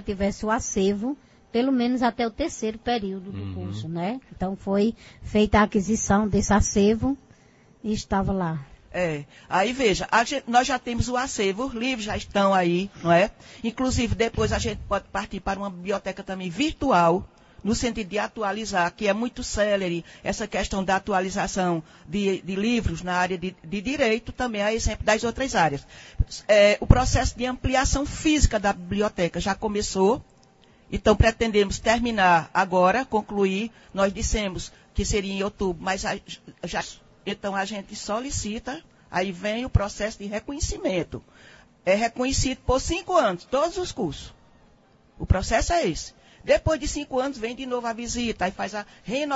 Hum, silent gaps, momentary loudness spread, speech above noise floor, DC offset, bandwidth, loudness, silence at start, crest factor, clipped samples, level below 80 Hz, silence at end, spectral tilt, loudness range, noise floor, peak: none; none; 11 LU; 33 dB; under 0.1%; 8 kHz; -25 LUFS; 0 s; 24 dB; under 0.1%; -36 dBFS; 0 s; -4.5 dB/octave; 6 LU; -57 dBFS; 0 dBFS